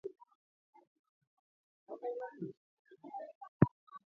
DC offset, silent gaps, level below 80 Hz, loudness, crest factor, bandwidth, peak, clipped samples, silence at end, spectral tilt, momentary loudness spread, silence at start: under 0.1%; 0.35-0.73 s, 0.87-1.21 s, 1.27-1.87 s, 2.57-2.85 s, 3.35-3.41 s, 3.48-3.60 s, 3.71-3.87 s; -66 dBFS; -39 LUFS; 32 dB; 4.3 kHz; -10 dBFS; under 0.1%; 0.15 s; -11 dB/octave; 20 LU; 0.05 s